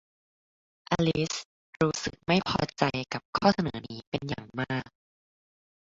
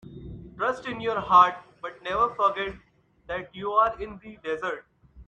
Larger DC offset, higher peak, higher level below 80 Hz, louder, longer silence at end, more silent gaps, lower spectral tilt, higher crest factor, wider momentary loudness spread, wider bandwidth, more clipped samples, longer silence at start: neither; about the same, -8 dBFS vs -6 dBFS; about the same, -56 dBFS vs -54 dBFS; second, -29 LUFS vs -25 LUFS; first, 1.1 s vs 0.05 s; first, 1.45-1.73 s, 3.25-3.33 s, 4.07-4.12 s vs none; about the same, -5 dB/octave vs -5 dB/octave; about the same, 24 dB vs 22 dB; second, 10 LU vs 20 LU; about the same, 8 kHz vs 8.6 kHz; neither; first, 0.9 s vs 0.05 s